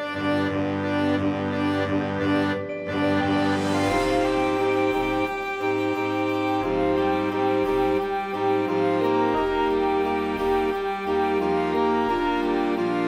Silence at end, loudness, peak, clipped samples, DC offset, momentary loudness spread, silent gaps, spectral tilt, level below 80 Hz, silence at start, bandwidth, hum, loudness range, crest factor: 0 s; -24 LUFS; -10 dBFS; under 0.1%; under 0.1%; 3 LU; none; -6.5 dB/octave; -46 dBFS; 0 s; 15 kHz; none; 1 LU; 14 dB